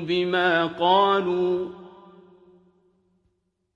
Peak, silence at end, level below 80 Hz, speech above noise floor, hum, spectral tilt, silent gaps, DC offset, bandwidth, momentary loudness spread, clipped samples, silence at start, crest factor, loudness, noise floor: -6 dBFS; 1.85 s; -68 dBFS; 50 dB; none; -6.5 dB/octave; none; under 0.1%; 7.2 kHz; 12 LU; under 0.1%; 0 s; 18 dB; -22 LUFS; -72 dBFS